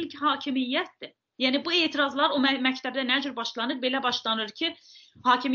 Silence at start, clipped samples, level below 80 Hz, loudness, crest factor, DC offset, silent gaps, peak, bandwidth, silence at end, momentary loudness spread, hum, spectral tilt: 0 s; under 0.1%; -76 dBFS; -26 LUFS; 20 dB; under 0.1%; none; -8 dBFS; 7.2 kHz; 0 s; 8 LU; none; 0.5 dB/octave